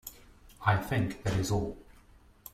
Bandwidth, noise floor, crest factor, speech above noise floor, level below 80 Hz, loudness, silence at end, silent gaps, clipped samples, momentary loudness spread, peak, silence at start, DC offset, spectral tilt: 16 kHz; -58 dBFS; 22 dB; 29 dB; -50 dBFS; -31 LUFS; 0.7 s; none; under 0.1%; 20 LU; -12 dBFS; 0.05 s; under 0.1%; -6 dB/octave